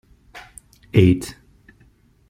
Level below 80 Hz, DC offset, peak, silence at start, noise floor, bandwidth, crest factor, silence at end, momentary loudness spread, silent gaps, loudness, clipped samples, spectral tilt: -46 dBFS; under 0.1%; -2 dBFS; 0.35 s; -55 dBFS; 15 kHz; 20 dB; 1 s; 25 LU; none; -18 LUFS; under 0.1%; -7.5 dB/octave